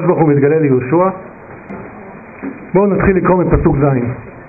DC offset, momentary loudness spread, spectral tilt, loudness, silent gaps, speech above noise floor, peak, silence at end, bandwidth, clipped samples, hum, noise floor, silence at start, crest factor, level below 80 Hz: under 0.1%; 20 LU; -13.5 dB/octave; -13 LUFS; none; 21 dB; -2 dBFS; 0 s; 2.7 kHz; under 0.1%; none; -33 dBFS; 0 s; 12 dB; -30 dBFS